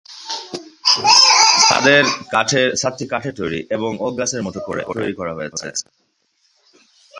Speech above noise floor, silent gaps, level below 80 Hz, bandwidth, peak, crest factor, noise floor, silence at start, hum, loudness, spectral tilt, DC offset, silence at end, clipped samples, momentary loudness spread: 44 dB; none; -54 dBFS; 11.5 kHz; 0 dBFS; 18 dB; -64 dBFS; 0.1 s; none; -15 LUFS; -1.5 dB/octave; under 0.1%; 0 s; under 0.1%; 18 LU